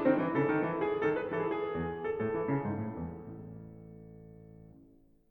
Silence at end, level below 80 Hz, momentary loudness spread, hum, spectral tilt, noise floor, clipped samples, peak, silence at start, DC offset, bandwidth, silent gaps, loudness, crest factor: 0.45 s; -60 dBFS; 22 LU; none; -9.5 dB/octave; -61 dBFS; under 0.1%; -16 dBFS; 0 s; under 0.1%; 4.5 kHz; none; -33 LUFS; 18 dB